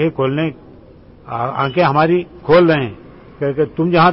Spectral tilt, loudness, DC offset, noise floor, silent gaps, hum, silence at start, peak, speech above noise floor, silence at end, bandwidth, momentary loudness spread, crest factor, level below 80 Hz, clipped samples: -12 dB/octave; -16 LUFS; under 0.1%; -42 dBFS; none; none; 0 s; -2 dBFS; 27 dB; 0 s; 5.8 kHz; 11 LU; 14 dB; -46 dBFS; under 0.1%